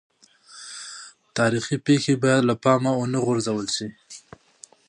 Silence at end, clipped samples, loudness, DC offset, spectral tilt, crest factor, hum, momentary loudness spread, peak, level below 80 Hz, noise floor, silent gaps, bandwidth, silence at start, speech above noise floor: 0.7 s; under 0.1%; -22 LUFS; under 0.1%; -5 dB/octave; 20 dB; none; 21 LU; -4 dBFS; -64 dBFS; -51 dBFS; none; 11 kHz; 0.55 s; 30 dB